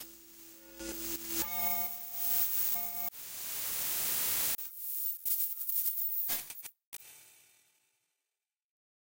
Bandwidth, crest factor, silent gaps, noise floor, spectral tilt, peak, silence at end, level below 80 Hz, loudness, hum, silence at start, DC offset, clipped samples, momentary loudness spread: 16.5 kHz; 20 dB; 6.86-6.92 s; under -90 dBFS; 0 dB/octave; -16 dBFS; 1.7 s; -66 dBFS; -31 LUFS; none; 0 s; under 0.1%; under 0.1%; 19 LU